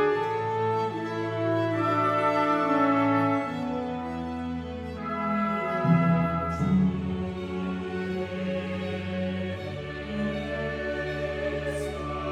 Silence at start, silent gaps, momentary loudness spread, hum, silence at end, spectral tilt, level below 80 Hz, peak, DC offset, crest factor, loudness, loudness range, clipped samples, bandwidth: 0 s; none; 10 LU; none; 0 s; -7.5 dB/octave; -48 dBFS; -10 dBFS; under 0.1%; 16 dB; -28 LUFS; 6 LU; under 0.1%; 12 kHz